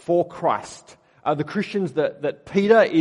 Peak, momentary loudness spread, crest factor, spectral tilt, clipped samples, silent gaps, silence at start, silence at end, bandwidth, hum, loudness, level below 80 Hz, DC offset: -2 dBFS; 12 LU; 18 dB; -6.5 dB/octave; under 0.1%; none; 0.1 s; 0 s; 11 kHz; none; -22 LUFS; -64 dBFS; under 0.1%